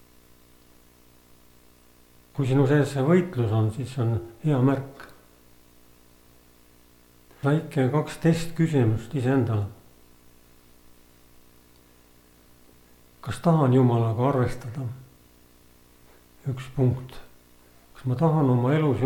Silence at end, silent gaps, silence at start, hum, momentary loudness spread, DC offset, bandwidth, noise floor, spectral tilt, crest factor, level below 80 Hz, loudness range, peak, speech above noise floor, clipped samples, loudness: 0 s; none; 2.35 s; 60 Hz at -50 dBFS; 15 LU; under 0.1%; 18.5 kHz; -56 dBFS; -8 dB/octave; 18 dB; -52 dBFS; 8 LU; -8 dBFS; 33 dB; under 0.1%; -24 LUFS